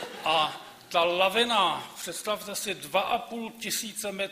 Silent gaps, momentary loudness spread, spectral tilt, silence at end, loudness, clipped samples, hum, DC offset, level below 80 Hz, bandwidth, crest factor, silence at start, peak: none; 11 LU; -1.5 dB/octave; 0 s; -28 LUFS; under 0.1%; none; under 0.1%; -68 dBFS; 15.5 kHz; 20 dB; 0 s; -8 dBFS